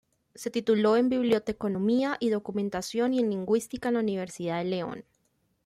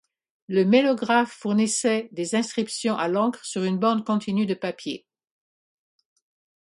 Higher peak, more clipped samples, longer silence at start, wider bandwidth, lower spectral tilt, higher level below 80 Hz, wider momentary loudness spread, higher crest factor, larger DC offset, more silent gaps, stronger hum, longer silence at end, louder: second, -12 dBFS vs -4 dBFS; neither; about the same, 0.4 s vs 0.5 s; first, 14.5 kHz vs 11.5 kHz; first, -6 dB/octave vs -4.5 dB/octave; first, -64 dBFS vs -72 dBFS; about the same, 9 LU vs 9 LU; about the same, 16 dB vs 20 dB; neither; neither; neither; second, 0.65 s vs 1.7 s; second, -28 LUFS vs -24 LUFS